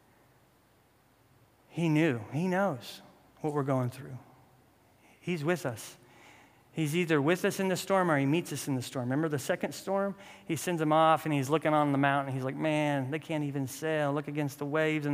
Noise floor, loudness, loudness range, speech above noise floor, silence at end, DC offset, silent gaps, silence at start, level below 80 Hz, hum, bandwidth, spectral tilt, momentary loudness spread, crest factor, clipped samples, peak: -65 dBFS; -30 LUFS; 7 LU; 35 dB; 0 s; under 0.1%; none; 1.7 s; -74 dBFS; none; 16 kHz; -6 dB/octave; 12 LU; 20 dB; under 0.1%; -10 dBFS